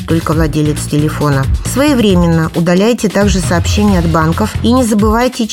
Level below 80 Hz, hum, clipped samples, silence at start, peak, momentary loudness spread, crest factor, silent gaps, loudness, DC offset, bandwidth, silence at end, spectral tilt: -22 dBFS; none; under 0.1%; 0 s; 0 dBFS; 4 LU; 10 dB; none; -12 LUFS; under 0.1%; 17 kHz; 0 s; -6 dB/octave